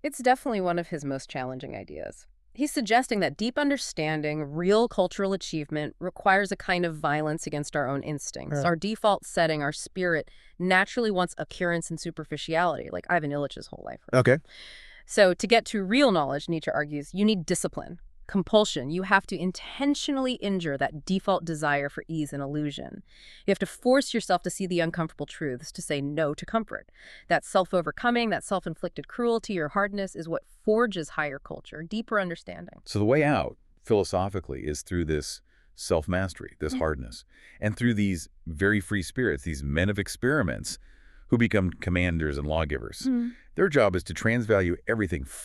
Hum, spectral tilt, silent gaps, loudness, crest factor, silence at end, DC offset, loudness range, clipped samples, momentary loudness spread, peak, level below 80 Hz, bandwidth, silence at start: none; -5 dB/octave; none; -27 LUFS; 24 dB; 0 s; under 0.1%; 4 LU; under 0.1%; 12 LU; -4 dBFS; -48 dBFS; 13.5 kHz; 0.05 s